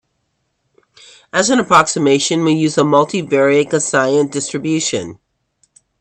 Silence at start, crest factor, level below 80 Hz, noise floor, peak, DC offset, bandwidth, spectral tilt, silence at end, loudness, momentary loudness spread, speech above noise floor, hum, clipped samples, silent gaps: 1.35 s; 16 dB; -58 dBFS; -68 dBFS; 0 dBFS; under 0.1%; 10.5 kHz; -4 dB/octave; 0.85 s; -14 LUFS; 8 LU; 54 dB; none; under 0.1%; none